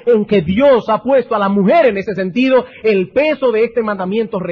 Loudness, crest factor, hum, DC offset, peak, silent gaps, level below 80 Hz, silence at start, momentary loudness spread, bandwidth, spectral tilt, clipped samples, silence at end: -14 LUFS; 10 dB; none; under 0.1%; -4 dBFS; none; -50 dBFS; 0.05 s; 7 LU; 6.4 kHz; -8.5 dB/octave; under 0.1%; 0 s